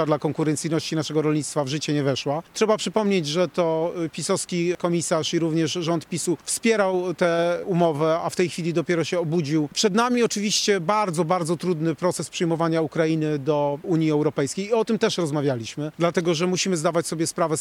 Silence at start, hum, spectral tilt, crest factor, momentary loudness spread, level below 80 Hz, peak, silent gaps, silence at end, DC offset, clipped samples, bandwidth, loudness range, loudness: 0 s; none; -5 dB/octave; 16 dB; 4 LU; -64 dBFS; -8 dBFS; none; 0 s; under 0.1%; under 0.1%; 16 kHz; 1 LU; -23 LUFS